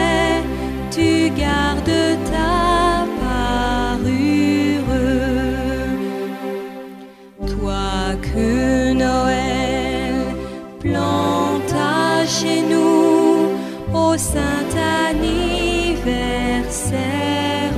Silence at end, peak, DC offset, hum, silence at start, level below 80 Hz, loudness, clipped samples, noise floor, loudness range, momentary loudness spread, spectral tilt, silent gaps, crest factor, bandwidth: 0 s; -2 dBFS; under 0.1%; none; 0 s; -30 dBFS; -18 LUFS; under 0.1%; -38 dBFS; 5 LU; 9 LU; -5 dB/octave; none; 14 dB; 15.5 kHz